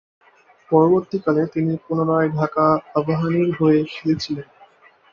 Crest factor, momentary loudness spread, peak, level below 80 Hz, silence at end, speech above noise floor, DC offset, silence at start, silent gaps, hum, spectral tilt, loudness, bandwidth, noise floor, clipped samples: 16 dB; 6 LU; -2 dBFS; -58 dBFS; 0.7 s; 33 dB; under 0.1%; 0.7 s; none; none; -8 dB/octave; -19 LUFS; 7 kHz; -51 dBFS; under 0.1%